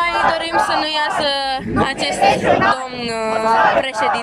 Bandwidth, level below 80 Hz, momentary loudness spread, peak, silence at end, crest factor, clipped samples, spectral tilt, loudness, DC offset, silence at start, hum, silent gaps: 14 kHz; -44 dBFS; 6 LU; 0 dBFS; 0 s; 16 dB; under 0.1%; -3.5 dB/octave; -16 LUFS; under 0.1%; 0 s; none; none